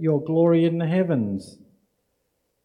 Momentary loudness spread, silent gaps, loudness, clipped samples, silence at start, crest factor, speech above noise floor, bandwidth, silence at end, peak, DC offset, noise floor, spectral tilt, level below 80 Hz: 9 LU; none; -21 LUFS; under 0.1%; 0 s; 16 dB; 52 dB; 11 kHz; 1.15 s; -8 dBFS; under 0.1%; -73 dBFS; -9 dB/octave; -70 dBFS